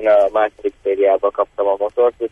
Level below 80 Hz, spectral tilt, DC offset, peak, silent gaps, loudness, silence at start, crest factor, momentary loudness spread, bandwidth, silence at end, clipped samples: -54 dBFS; -5.5 dB/octave; under 0.1%; -4 dBFS; none; -17 LUFS; 0 s; 12 dB; 7 LU; 3.8 kHz; 0.05 s; under 0.1%